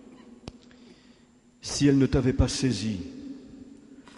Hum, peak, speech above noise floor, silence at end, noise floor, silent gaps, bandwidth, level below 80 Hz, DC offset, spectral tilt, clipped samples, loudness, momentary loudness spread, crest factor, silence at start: none; -10 dBFS; 34 dB; 0.15 s; -58 dBFS; none; 11.5 kHz; -40 dBFS; under 0.1%; -5.5 dB/octave; under 0.1%; -25 LUFS; 25 LU; 20 dB; 0.1 s